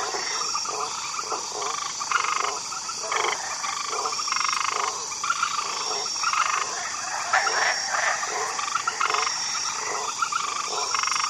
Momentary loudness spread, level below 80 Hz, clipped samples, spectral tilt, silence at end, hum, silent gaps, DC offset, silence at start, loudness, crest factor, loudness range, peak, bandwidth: 5 LU; -70 dBFS; under 0.1%; 1.5 dB/octave; 0 s; none; none; under 0.1%; 0 s; -25 LUFS; 18 dB; 2 LU; -8 dBFS; 15.5 kHz